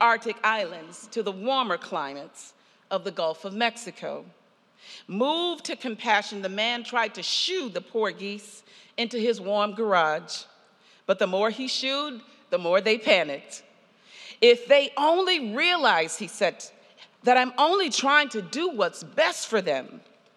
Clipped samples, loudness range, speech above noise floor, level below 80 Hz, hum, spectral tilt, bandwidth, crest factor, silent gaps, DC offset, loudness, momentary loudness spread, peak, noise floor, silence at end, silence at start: under 0.1%; 7 LU; 33 dB; under -90 dBFS; none; -2.5 dB/octave; 12.5 kHz; 22 dB; none; under 0.1%; -25 LUFS; 16 LU; -4 dBFS; -58 dBFS; 0.35 s; 0 s